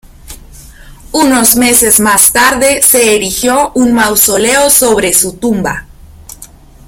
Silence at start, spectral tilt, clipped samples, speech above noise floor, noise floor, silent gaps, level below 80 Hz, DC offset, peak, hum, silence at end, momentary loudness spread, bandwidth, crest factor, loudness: 0.25 s; -2 dB/octave; 0.9%; 26 dB; -35 dBFS; none; -34 dBFS; under 0.1%; 0 dBFS; none; 0.4 s; 8 LU; over 20 kHz; 10 dB; -7 LUFS